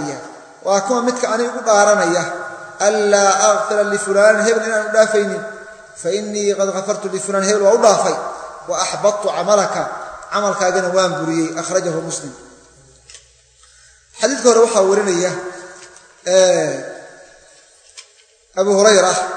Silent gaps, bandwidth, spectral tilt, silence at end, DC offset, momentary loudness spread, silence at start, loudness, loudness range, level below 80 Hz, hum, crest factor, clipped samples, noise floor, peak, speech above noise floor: none; 9.4 kHz; -3 dB/octave; 0 s; under 0.1%; 16 LU; 0 s; -16 LUFS; 6 LU; -62 dBFS; none; 16 dB; under 0.1%; -51 dBFS; 0 dBFS; 36 dB